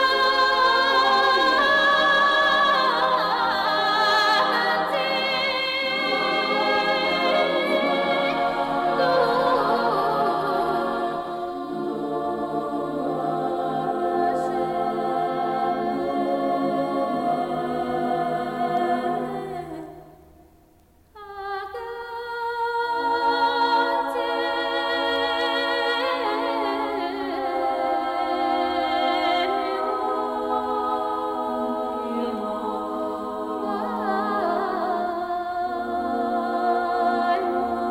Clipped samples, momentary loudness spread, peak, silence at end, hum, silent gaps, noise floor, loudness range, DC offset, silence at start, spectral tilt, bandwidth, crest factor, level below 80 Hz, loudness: under 0.1%; 10 LU; -10 dBFS; 0 s; none; none; -56 dBFS; 8 LU; under 0.1%; 0 s; -4.5 dB/octave; 16.5 kHz; 14 dB; -56 dBFS; -23 LUFS